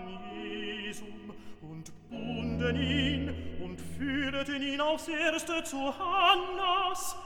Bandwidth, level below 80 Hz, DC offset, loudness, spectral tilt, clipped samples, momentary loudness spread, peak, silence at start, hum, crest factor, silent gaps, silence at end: 19 kHz; -50 dBFS; under 0.1%; -31 LUFS; -4 dB/octave; under 0.1%; 19 LU; -10 dBFS; 0 s; none; 22 dB; none; 0 s